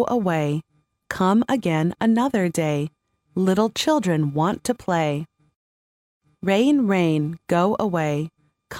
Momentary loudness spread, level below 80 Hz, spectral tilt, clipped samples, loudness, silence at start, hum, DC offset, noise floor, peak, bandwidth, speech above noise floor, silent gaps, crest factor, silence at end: 10 LU; -58 dBFS; -6 dB/octave; under 0.1%; -22 LUFS; 0 s; none; under 0.1%; under -90 dBFS; -6 dBFS; 16.5 kHz; over 69 dB; 5.56-6.20 s; 16 dB; 0 s